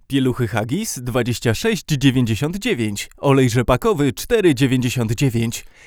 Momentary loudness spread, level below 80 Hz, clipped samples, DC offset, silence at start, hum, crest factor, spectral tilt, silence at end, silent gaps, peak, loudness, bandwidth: 6 LU; -40 dBFS; under 0.1%; under 0.1%; 0.1 s; none; 18 dB; -5.5 dB/octave; 0.25 s; none; 0 dBFS; -19 LUFS; 18.5 kHz